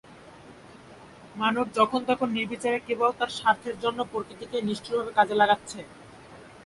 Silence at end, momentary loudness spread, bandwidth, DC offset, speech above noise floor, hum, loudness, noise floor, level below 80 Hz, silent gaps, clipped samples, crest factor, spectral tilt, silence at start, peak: 0.05 s; 11 LU; 11.5 kHz; under 0.1%; 22 dB; none; -26 LUFS; -49 dBFS; -64 dBFS; none; under 0.1%; 22 dB; -4.5 dB/octave; 0.1 s; -6 dBFS